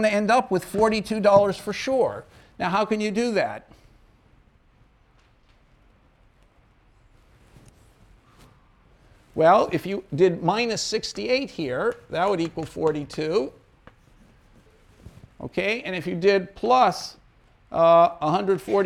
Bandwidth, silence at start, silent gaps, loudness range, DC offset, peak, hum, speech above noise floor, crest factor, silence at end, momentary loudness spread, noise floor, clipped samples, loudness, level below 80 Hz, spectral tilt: 15 kHz; 0 s; none; 8 LU; under 0.1%; -4 dBFS; none; 36 dB; 20 dB; 0 s; 12 LU; -59 dBFS; under 0.1%; -23 LUFS; -56 dBFS; -5 dB/octave